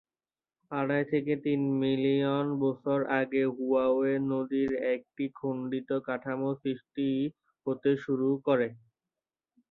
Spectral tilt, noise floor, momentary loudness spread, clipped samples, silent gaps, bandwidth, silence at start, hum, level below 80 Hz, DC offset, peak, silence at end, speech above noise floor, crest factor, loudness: -9.5 dB/octave; under -90 dBFS; 8 LU; under 0.1%; none; 4.3 kHz; 0.7 s; none; -72 dBFS; under 0.1%; -12 dBFS; 0.95 s; over 61 dB; 18 dB; -30 LUFS